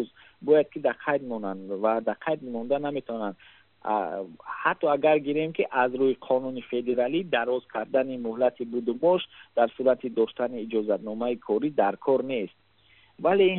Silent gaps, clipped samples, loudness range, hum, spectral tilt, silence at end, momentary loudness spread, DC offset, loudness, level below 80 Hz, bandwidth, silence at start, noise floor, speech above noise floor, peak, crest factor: none; under 0.1%; 4 LU; none; -4 dB/octave; 0 s; 10 LU; under 0.1%; -27 LUFS; -72 dBFS; 4.2 kHz; 0 s; -60 dBFS; 34 dB; -8 dBFS; 18 dB